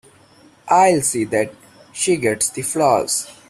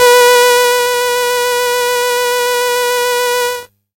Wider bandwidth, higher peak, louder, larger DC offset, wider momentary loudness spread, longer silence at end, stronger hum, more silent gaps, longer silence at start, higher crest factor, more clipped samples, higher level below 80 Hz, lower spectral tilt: about the same, 15.5 kHz vs 17 kHz; about the same, -2 dBFS vs 0 dBFS; second, -18 LUFS vs -12 LUFS; neither; about the same, 8 LU vs 6 LU; second, 0.15 s vs 0.3 s; neither; neither; first, 0.65 s vs 0 s; about the same, 16 dB vs 12 dB; neither; about the same, -58 dBFS vs -58 dBFS; first, -3.5 dB/octave vs 1.5 dB/octave